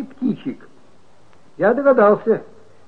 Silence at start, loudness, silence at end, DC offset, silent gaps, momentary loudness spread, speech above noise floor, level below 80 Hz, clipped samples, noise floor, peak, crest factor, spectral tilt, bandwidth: 0 s; -17 LUFS; 0.45 s; 0.7%; none; 16 LU; 37 dB; -64 dBFS; under 0.1%; -53 dBFS; -2 dBFS; 18 dB; -9 dB/octave; 5 kHz